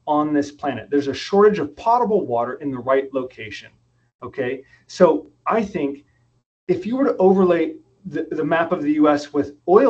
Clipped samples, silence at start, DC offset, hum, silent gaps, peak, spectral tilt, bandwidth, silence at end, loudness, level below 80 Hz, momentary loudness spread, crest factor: under 0.1%; 0.05 s; under 0.1%; none; 4.15-4.19 s, 6.46-6.67 s; 0 dBFS; -7 dB/octave; 8.2 kHz; 0 s; -20 LUFS; -58 dBFS; 17 LU; 20 dB